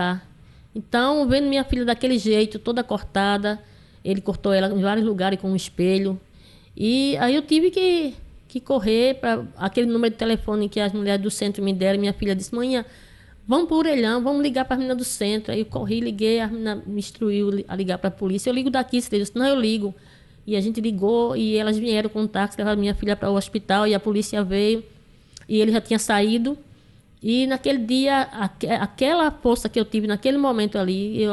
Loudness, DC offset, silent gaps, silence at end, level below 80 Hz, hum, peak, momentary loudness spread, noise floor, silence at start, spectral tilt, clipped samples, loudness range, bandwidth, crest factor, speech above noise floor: -22 LUFS; under 0.1%; none; 0 s; -44 dBFS; none; -6 dBFS; 7 LU; -52 dBFS; 0 s; -5 dB/octave; under 0.1%; 2 LU; 12.5 kHz; 16 dB; 30 dB